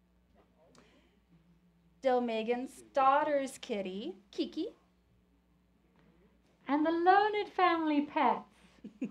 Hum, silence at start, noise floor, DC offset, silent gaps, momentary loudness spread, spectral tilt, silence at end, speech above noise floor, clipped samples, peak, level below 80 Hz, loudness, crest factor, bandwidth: none; 2.05 s; -69 dBFS; under 0.1%; none; 14 LU; -5 dB/octave; 0 s; 39 dB; under 0.1%; -14 dBFS; -74 dBFS; -32 LUFS; 20 dB; 12.5 kHz